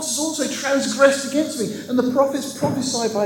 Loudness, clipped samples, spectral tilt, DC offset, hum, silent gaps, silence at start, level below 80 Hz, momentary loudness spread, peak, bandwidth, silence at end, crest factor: -20 LUFS; under 0.1%; -3.5 dB/octave; under 0.1%; none; none; 0 s; -66 dBFS; 7 LU; 0 dBFS; 17.5 kHz; 0 s; 20 dB